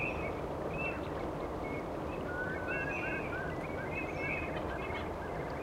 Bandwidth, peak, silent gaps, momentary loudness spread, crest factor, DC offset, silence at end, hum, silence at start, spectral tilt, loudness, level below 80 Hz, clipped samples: 16 kHz; -24 dBFS; none; 4 LU; 14 dB; under 0.1%; 0 s; none; 0 s; -6.5 dB/octave; -37 LUFS; -50 dBFS; under 0.1%